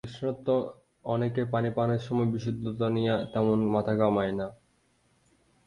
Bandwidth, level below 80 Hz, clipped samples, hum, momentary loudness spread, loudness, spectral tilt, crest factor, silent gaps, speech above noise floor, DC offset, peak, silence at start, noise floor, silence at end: 10.5 kHz; -58 dBFS; under 0.1%; none; 8 LU; -29 LUFS; -8.5 dB/octave; 18 dB; none; 41 dB; under 0.1%; -10 dBFS; 0.05 s; -68 dBFS; 1.1 s